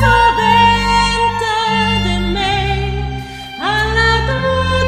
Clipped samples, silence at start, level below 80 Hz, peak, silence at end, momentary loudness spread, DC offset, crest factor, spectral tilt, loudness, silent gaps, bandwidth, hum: under 0.1%; 0 s; -24 dBFS; 0 dBFS; 0 s; 11 LU; under 0.1%; 14 dB; -4.5 dB/octave; -14 LUFS; none; 14.5 kHz; none